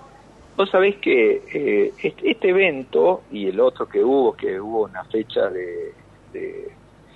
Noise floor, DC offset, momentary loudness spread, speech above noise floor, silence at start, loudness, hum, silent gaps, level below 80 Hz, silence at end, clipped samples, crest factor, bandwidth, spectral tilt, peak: -47 dBFS; under 0.1%; 15 LU; 27 dB; 0.6 s; -20 LUFS; none; none; -58 dBFS; 0.45 s; under 0.1%; 16 dB; 4.5 kHz; -7 dB/octave; -4 dBFS